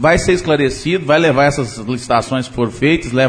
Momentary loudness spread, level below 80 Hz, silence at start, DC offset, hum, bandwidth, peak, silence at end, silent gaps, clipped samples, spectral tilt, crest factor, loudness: 8 LU; -34 dBFS; 0 s; under 0.1%; none; 10.5 kHz; 0 dBFS; 0 s; none; under 0.1%; -5.5 dB/octave; 14 dB; -15 LUFS